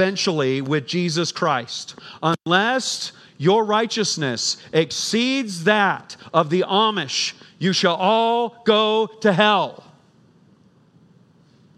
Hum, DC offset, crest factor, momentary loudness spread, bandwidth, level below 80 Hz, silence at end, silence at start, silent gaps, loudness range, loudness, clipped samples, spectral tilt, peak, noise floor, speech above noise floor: none; under 0.1%; 20 dB; 8 LU; 13.5 kHz; -74 dBFS; 2.05 s; 0 s; none; 2 LU; -20 LUFS; under 0.1%; -4 dB/octave; 0 dBFS; -55 dBFS; 34 dB